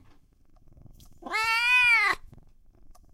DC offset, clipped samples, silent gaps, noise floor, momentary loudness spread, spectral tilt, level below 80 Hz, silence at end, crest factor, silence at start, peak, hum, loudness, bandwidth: under 0.1%; under 0.1%; none; -57 dBFS; 13 LU; -0.5 dB/octave; -54 dBFS; 0.2 s; 18 dB; 0.9 s; -10 dBFS; none; -22 LUFS; 16 kHz